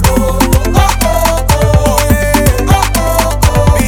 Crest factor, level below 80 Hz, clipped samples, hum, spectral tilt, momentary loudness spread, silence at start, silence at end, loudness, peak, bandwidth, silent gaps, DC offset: 8 dB; -14 dBFS; under 0.1%; none; -5 dB/octave; 2 LU; 0 s; 0 s; -10 LUFS; 0 dBFS; over 20 kHz; none; under 0.1%